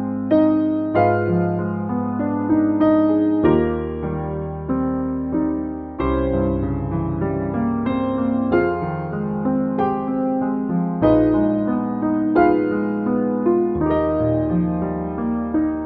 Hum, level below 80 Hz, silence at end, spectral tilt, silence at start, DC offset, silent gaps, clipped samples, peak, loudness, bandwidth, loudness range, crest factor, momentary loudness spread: none; -38 dBFS; 0 s; -12 dB/octave; 0 s; under 0.1%; none; under 0.1%; -4 dBFS; -20 LUFS; 4.6 kHz; 4 LU; 16 dB; 8 LU